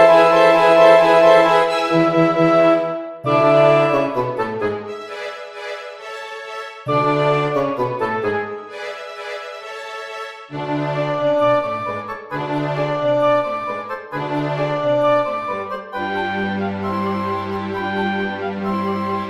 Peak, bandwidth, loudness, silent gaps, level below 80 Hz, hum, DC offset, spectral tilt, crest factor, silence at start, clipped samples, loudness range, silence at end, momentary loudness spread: 0 dBFS; 12.5 kHz; -17 LUFS; none; -56 dBFS; none; under 0.1%; -6.5 dB/octave; 18 dB; 0 s; under 0.1%; 10 LU; 0 s; 18 LU